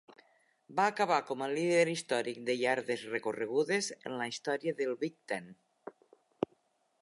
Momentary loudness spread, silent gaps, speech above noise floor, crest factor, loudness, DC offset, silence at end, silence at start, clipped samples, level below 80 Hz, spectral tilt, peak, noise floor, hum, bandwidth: 11 LU; none; 40 dB; 20 dB; -33 LUFS; under 0.1%; 1.1 s; 0.7 s; under 0.1%; -82 dBFS; -4 dB/octave; -14 dBFS; -73 dBFS; none; 11.5 kHz